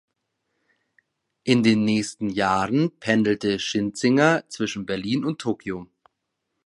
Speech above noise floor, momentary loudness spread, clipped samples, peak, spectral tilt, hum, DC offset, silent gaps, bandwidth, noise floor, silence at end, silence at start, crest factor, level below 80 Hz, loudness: 57 dB; 10 LU; under 0.1%; -2 dBFS; -5 dB/octave; none; under 0.1%; none; 11.5 kHz; -79 dBFS; 0.8 s; 1.45 s; 22 dB; -58 dBFS; -23 LUFS